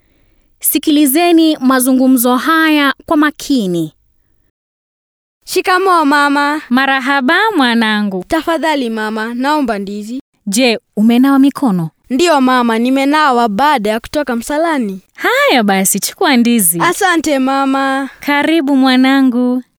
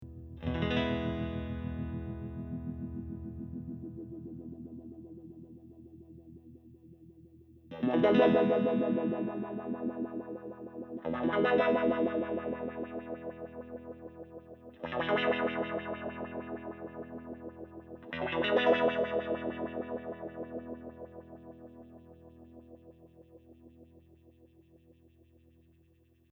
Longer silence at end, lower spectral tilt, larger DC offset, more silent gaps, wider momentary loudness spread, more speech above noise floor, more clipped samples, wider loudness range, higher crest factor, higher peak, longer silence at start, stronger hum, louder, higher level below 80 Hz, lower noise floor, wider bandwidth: second, 0.15 s vs 2.35 s; second, -3.5 dB/octave vs -8.5 dB/octave; neither; first, 4.50-5.41 s, 10.21-10.33 s vs none; second, 8 LU vs 24 LU; first, 44 dB vs 37 dB; neither; second, 4 LU vs 18 LU; second, 12 dB vs 22 dB; first, 0 dBFS vs -14 dBFS; first, 0.6 s vs 0 s; neither; first, -12 LUFS vs -33 LUFS; first, -50 dBFS vs -56 dBFS; second, -55 dBFS vs -66 dBFS; first, over 20 kHz vs 6.2 kHz